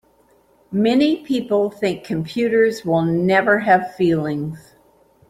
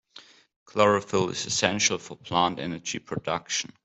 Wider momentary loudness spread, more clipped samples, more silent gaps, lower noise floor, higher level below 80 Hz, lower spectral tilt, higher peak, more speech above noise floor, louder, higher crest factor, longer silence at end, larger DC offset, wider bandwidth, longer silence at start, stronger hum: about the same, 10 LU vs 10 LU; neither; second, none vs 0.56-0.66 s; first, -56 dBFS vs -52 dBFS; first, -56 dBFS vs -64 dBFS; first, -7 dB/octave vs -3 dB/octave; first, -2 dBFS vs -6 dBFS; first, 38 dB vs 26 dB; first, -18 LUFS vs -26 LUFS; second, 16 dB vs 22 dB; first, 0.7 s vs 0.15 s; neither; first, 15.5 kHz vs 8.4 kHz; first, 0.7 s vs 0.15 s; neither